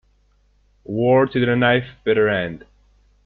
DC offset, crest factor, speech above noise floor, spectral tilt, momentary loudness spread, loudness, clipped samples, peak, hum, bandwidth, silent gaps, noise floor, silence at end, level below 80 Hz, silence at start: under 0.1%; 18 dB; 41 dB; -9.5 dB/octave; 13 LU; -19 LUFS; under 0.1%; -4 dBFS; 50 Hz at -45 dBFS; 4.6 kHz; none; -59 dBFS; 0.7 s; -52 dBFS; 0.9 s